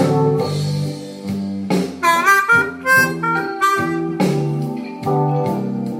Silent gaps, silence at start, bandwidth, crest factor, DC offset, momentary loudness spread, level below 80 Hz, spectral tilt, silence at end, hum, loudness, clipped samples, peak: none; 0 s; 16 kHz; 16 dB; under 0.1%; 11 LU; -56 dBFS; -5.5 dB/octave; 0 s; none; -17 LUFS; under 0.1%; 0 dBFS